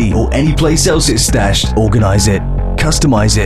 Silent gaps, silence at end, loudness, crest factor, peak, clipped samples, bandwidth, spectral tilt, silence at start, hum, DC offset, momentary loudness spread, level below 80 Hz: none; 0 s; -12 LUFS; 10 dB; 0 dBFS; under 0.1%; 13.5 kHz; -4.5 dB/octave; 0 s; none; 3%; 3 LU; -18 dBFS